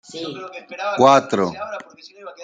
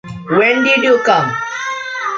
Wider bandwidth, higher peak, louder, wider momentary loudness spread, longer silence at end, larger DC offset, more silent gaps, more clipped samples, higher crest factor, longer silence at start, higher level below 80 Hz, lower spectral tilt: first, 9.2 kHz vs 7.6 kHz; about the same, -2 dBFS vs -2 dBFS; second, -18 LUFS vs -13 LUFS; first, 21 LU vs 10 LU; about the same, 0 s vs 0 s; neither; neither; neither; first, 20 dB vs 14 dB; about the same, 0.1 s vs 0.05 s; second, -66 dBFS vs -56 dBFS; about the same, -5 dB/octave vs -4.5 dB/octave